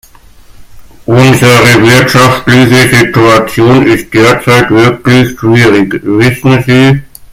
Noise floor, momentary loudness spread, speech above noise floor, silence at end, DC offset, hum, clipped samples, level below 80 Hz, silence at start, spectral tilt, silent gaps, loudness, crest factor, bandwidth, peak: -35 dBFS; 5 LU; 30 dB; 0.25 s; under 0.1%; none; 4%; -34 dBFS; 0.6 s; -5.5 dB/octave; none; -5 LUFS; 6 dB; 17 kHz; 0 dBFS